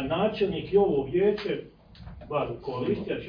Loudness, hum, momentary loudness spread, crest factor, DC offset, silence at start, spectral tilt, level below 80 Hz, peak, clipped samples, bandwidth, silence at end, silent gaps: -27 LUFS; none; 10 LU; 16 dB; under 0.1%; 0 s; -9 dB/octave; -50 dBFS; -10 dBFS; under 0.1%; 5.2 kHz; 0 s; none